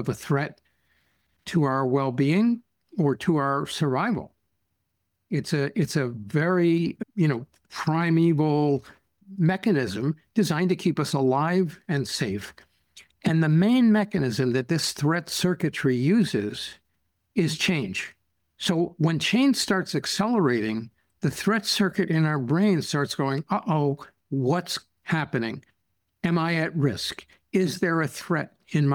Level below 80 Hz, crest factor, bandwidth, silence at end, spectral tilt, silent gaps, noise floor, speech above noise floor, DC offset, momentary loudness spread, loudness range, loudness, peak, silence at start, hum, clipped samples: -62 dBFS; 14 dB; 18 kHz; 0 s; -6 dB/octave; none; -77 dBFS; 53 dB; under 0.1%; 10 LU; 3 LU; -25 LUFS; -10 dBFS; 0 s; none; under 0.1%